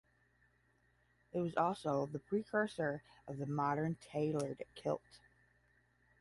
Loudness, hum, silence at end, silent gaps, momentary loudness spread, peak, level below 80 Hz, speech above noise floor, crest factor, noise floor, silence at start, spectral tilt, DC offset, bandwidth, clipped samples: -39 LUFS; 60 Hz at -65 dBFS; 1.05 s; none; 8 LU; -20 dBFS; -74 dBFS; 36 dB; 20 dB; -75 dBFS; 1.35 s; -7 dB/octave; under 0.1%; 11.5 kHz; under 0.1%